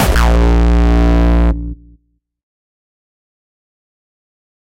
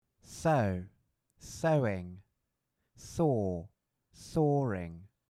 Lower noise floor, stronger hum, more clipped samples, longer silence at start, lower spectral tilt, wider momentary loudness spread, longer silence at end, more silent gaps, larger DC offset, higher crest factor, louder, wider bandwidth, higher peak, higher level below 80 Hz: second, -56 dBFS vs -83 dBFS; neither; neither; second, 0 s vs 0.3 s; about the same, -6.5 dB/octave vs -7 dB/octave; second, 8 LU vs 21 LU; first, 3.05 s vs 0.25 s; neither; neither; about the same, 14 dB vs 18 dB; first, -13 LUFS vs -32 LUFS; first, 16 kHz vs 14 kHz; first, 0 dBFS vs -16 dBFS; first, -16 dBFS vs -62 dBFS